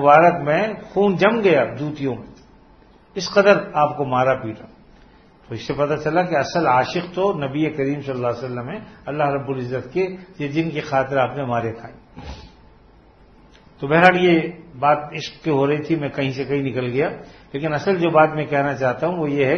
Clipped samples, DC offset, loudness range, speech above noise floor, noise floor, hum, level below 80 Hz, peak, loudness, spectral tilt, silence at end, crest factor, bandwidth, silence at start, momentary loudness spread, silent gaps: under 0.1%; under 0.1%; 5 LU; 31 dB; -50 dBFS; none; -52 dBFS; 0 dBFS; -20 LUFS; -6.5 dB/octave; 0 s; 20 dB; 6.6 kHz; 0 s; 17 LU; none